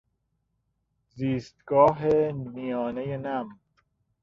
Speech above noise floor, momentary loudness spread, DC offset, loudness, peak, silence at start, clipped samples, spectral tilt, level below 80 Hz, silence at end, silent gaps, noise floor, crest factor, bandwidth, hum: 51 dB; 13 LU; under 0.1%; -26 LUFS; -8 dBFS; 1.15 s; under 0.1%; -8.5 dB/octave; -60 dBFS; 0.7 s; none; -76 dBFS; 20 dB; 7.4 kHz; none